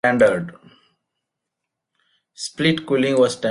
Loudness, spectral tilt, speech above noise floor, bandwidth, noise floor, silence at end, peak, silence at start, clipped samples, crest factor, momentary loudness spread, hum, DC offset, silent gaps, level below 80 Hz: -19 LUFS; -5 dB/octave; 63 dB; 11.5 kHz; -82 dBFS; 0 s; -4 dBFS; 0.05 s; under 0.1%; 18 dB; 15 LU; none; under 0.1%; none; -60 dBFS